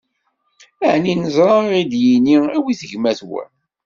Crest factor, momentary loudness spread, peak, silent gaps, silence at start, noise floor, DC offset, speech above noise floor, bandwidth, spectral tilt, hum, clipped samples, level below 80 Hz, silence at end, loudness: 16 dB; 10 LU; -2 dBFS; none; 0.8 s; -68 dBFS; under 0.1%; 53 dB; 7.4 kHz; -6.5 dB/octave; none; under 0.1%; -60 dBFS; 0.4 s; -16 LUFS